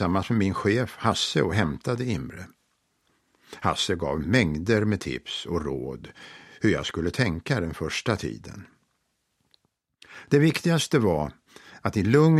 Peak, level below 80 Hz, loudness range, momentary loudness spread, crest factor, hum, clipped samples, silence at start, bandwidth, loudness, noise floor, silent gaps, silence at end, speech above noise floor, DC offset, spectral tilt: -4 dBFS; -48 dBFS; 2 LU; 18 LU; 20 dB; none; under 0.1%; 0 s; 14 kHz; -25 LUFS; -74 dBFS; none; 0 s; 50 dB; under 0.1%; -5.5 dB/octave